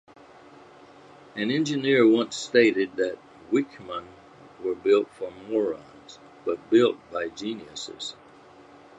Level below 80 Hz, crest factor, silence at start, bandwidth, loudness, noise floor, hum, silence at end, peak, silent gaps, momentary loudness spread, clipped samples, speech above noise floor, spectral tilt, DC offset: -68 dBFS; 20 dB; 1.35 s; 9 kHz; -25 LUFS; -51 dBFS; none; 0.85 s; -6 dBFS; none; 17 LU; under 0.1%; 26 dB; -5 dB/octave; under 0.1%